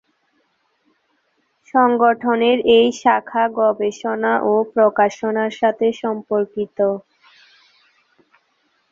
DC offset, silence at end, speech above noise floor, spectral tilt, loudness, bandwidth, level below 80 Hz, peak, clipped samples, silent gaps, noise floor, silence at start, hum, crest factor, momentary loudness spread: under 0.1%; 1.9 s; 49 dB; -5 dB/octave; -17 LUFS; 7.6 kHz; -62 dBFS; -2 dBFS; under 0.1%; none; -66 dBFS; 1.75 s; none; 18 dB; 8 LU